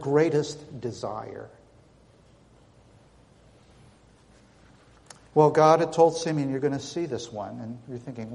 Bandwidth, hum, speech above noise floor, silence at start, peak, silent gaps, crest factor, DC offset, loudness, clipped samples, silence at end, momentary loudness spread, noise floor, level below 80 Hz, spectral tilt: 11 kHz; none; 32 dB; 0 s; -6 dBFS; none; 22 dB; under 0.1%; -25 LUFS; under 0.1%; 0 s; 19 LU; -57 dBFS; -64 dBFS; -6 dB/octave